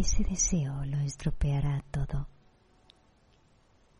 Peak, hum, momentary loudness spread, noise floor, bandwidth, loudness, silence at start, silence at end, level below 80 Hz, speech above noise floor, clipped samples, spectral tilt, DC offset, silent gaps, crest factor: -16 dBFS; none; 8 LU; -64 dBFS; 11 kHz; -31 LUFS; 0 s; 1.7 s; -36 dBFS; 35 dB; under 0.1%; -5 dB/octave; under 0.1%; none; 16 dB